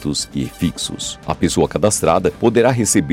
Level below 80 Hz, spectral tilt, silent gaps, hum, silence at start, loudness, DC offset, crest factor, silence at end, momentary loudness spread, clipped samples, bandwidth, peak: -40 dBFS; -4.5 dB/octave; none; none; 0 s; -17 LUFS; under 0.1%; 16 dB; 0 s; 9 LU; under 0.1%; 16.5 kHz; -2 dBFS